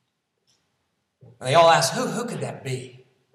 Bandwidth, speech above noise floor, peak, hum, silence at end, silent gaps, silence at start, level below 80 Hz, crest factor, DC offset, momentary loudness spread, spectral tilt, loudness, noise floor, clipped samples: 15 kHz; 53 dB; -4 dBFS; none; 0.45 s; none; 1.4 s; -76 dBFS; 20 dB; under 0.1%; 17 LU; -3.5 dB/octave; -21 LUFS; -74 dBFS; under 0.1%